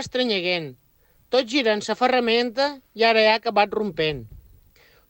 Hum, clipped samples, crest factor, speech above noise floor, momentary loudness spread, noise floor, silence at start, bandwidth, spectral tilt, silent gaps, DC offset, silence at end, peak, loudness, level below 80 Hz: none; under 0.1%; 18 dB; 34 dB; 8 LU; -56 dBFS; 0 s; 16.5 kHz; -4 dB/octave; none; under 0.1%; 0.7 s; -6 dBFS; -21 LUFS; -56 dBFS